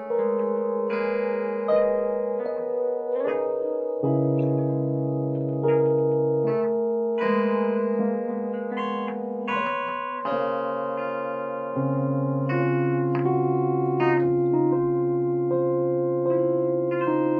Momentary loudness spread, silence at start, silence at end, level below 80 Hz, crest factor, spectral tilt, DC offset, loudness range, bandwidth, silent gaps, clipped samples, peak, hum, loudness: 6 LU; 0 s; 0 s; -66 dBFS; 14 dB; -10.5 dB/octave; under 0.1%; 4 LU; 5 kHz; none; under 0.1%; -10 dBFS; none; -25 LUFS